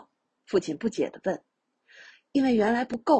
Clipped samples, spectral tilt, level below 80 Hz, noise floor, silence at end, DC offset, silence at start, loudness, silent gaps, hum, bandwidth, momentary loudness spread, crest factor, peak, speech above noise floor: under 0.1%; -6 dB/octave; -64 dBFS; -60 dBFS; 0 s; under 0.1%; 0.5 s; -27 LUFS; none; none; 9 kHz; 9 LU; 18 dB; -10 dBFS; 35 dB